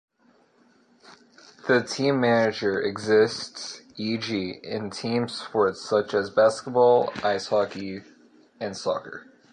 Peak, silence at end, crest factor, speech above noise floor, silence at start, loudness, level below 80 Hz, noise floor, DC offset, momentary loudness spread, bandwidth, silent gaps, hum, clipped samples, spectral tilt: -8 dBFS; 0.3 s; 18 dB; 38 dB; 1.1 s; -24 LUFS; -66 dBFS; -62 dBFS; under 0.1%; 14 LU; 11 kHz; none; none; under 0.1%; -5 dB/octave